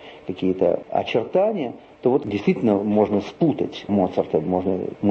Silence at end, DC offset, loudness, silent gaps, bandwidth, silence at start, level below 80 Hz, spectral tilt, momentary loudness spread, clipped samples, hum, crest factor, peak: 0 s; under 0.1%; -22 LUFS; none; 7 kHz; 0 s; -58 dBFS; -8.5 dB/octave; 6 LU; under 0.1%; none; 16 dB; -6 dBFS